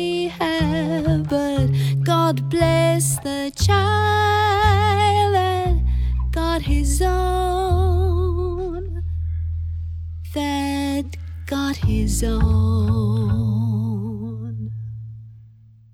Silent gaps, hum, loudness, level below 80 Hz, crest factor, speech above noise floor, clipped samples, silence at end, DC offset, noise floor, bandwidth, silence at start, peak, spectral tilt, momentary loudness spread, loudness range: none; none; -20 LUFS; -26 dBFS; 16 dB; 29 dB; under 0.1%; 0.45 s; under 0.1%; -47 dBFS; 16.5 kHz; 0 s; -4 dBFS; -5.5 dB/octave; 13 LU; 6 LU